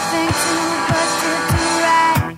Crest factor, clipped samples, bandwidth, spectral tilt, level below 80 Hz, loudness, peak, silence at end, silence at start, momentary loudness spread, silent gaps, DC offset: 14 dB; under 0.1%; 16 kHz; -3.5 dB/octave; -38 dBFS; -16 LUFS; -4 dBFS; 0 s; 0 s; 4 LU; none; under 0.1%